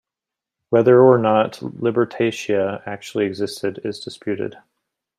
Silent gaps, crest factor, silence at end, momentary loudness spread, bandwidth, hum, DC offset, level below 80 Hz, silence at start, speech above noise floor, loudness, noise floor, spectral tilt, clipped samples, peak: none; 18 dB; 0.7 s; 17 LU; 12.5 kHz; none; under 0.1%; -64 dBFS; 0.7 s; 68 dB; -19 LUFS; -87 dBFS; -6.5 dB/octave; under 0.1%; -2 dBFS